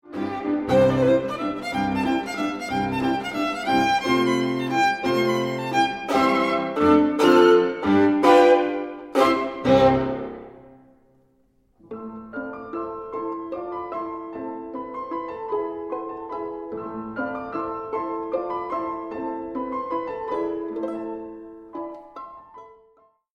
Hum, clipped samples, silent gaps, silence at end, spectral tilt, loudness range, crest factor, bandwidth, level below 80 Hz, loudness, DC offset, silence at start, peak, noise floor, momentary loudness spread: none; under 0.1%; none; 0.65 s; -6 dB/octave; 14 LU; 20 dB; 15.5 kHz; -54 dBFS; -23 LUFS; under 0.1%; 0.1 s; -2 dBFS; -62 dBFS; 16 LU